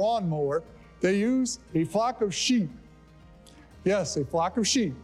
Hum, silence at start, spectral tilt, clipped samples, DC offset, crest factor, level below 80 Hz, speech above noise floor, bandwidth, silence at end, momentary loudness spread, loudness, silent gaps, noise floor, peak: none; 0 s; -4.5 dB/octave; under 0.1%; under 0.1%; 14 dB; -56 dBFS; 26 dB; 13 kHz; 0 s; 5 LU; -27 LUFS; none; -52 dBFS; -14 dBFS